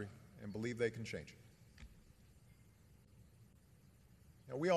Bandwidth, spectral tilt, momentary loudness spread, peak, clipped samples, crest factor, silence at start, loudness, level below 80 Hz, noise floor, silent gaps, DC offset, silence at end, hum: 13 kHz; -6 dB/octave; 26 LU; -22 dBFS; under 0.1%; 24 dB; 0 s; -44 LUFS; -70 dBFS; -66 dBFS; none; under 0.1%; 0 s; none